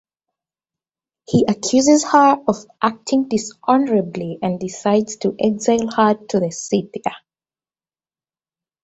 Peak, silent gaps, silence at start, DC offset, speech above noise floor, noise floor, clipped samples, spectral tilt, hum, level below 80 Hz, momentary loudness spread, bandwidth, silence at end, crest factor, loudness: -2 dBFS; none; 1.3 s; under 0.1%; over 73 dB; under -90 dBFS; under 0.1%; -5 dB/octave; none; -58 dBFS; 10 LU; 8.2 kHz; 1.65 s; 18 dB; -18 LUFS